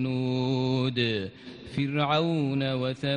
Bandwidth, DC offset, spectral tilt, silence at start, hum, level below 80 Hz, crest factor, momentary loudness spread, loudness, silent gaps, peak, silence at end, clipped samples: 9.4 kHz; under 0.1%; -7.5 dB/octave; 0 s; none; -60 dBFS; 16 dB; 9 LU; -27 LUFS; none; -12 dBFS; 0 s; under 0.1%